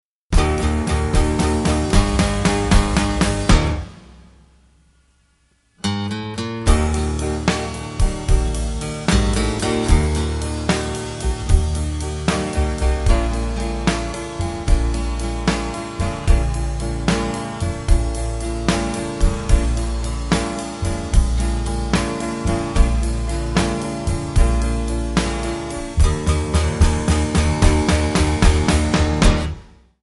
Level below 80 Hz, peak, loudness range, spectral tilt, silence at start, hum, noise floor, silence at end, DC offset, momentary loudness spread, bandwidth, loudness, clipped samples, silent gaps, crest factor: -20 dBFS; 0 dBFS; 5 LU; -5.5 dB/octave; 0.3 s; none; -60 dBFS; 0.4 s; under 0.1%; 8 LU; 11.5 kHz; -20 LUFS; under 0.1%; none; 18 dB